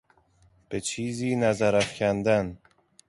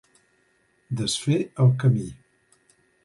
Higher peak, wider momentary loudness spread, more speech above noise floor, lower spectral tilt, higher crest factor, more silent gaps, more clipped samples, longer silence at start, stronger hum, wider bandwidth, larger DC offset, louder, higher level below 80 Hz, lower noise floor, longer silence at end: about the same, -10 dBFS vs -8 dBFS; second, 9 LU vs 12 LU; second, 37 dB vs 44 dB; about the same, -5 dB/octave vs -6 dB/octave; about the same, 16 dB vs 18 dB; neither; neither; second, 0.7 s vs 0.9 s; neither; about the same, 11.5 kHz vs 11.5 kHz; neither; second, -26 LUFS vs -23 LUFS; about the same, -56 dBFS vs -58 dBFS; second, -62 dBFS vs -66 dBFS; second, 0.55 s vs 0.9 s